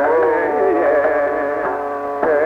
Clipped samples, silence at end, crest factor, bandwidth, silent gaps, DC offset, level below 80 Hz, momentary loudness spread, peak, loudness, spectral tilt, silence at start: under 0.1%; 0 s; 12 dB; 6.4 kHz; none; under 0.1%; -52 dBFS; 6 LU; -4 dBFS; -17 LUFS; -7 dB/octave; 0 s